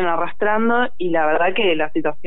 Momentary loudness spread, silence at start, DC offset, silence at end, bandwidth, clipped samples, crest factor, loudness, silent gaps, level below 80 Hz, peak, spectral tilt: 4 LU; 0 s; 8%; 0.15 s; 4.1 kHz; under 0.1%; 12 dB; -19 LUFS; none; -58 dBFS; -6 dBFS; -8 dB/octave